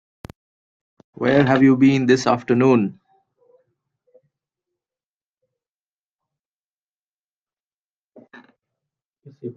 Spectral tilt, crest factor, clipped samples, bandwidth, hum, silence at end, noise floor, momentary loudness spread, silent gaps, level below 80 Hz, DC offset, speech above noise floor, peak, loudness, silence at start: -7 dB/octave; 20 dB; under 0.1%; 7.8 kHz; none; 0.05 s; under -90 dBFS; 10 LU; 5.06-5.33 s, 5.69-6.19 s, 6.45-7.47 s, 7.64-7.68 s, 7.74-8.08 s, 9.05-9.11 s; -60 dBFS; under 0.1%; over 74 dB; -2 dBFS; -17 LUFS; 1.2 s